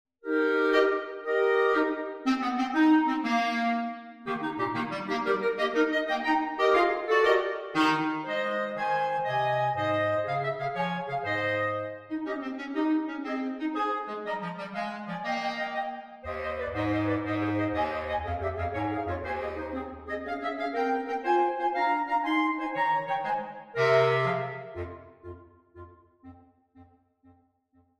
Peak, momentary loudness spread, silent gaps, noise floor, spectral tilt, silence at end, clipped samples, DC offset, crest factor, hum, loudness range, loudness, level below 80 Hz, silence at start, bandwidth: -10 dBFS; 11 LU; none; -67 dBFS; -6 dB/octave; 1.15 s; under 0.1%; under 0.1%; 18 dB; none; 6 LU; -28 LUFS; -56 dBFS; 0.25 s; 10 kHz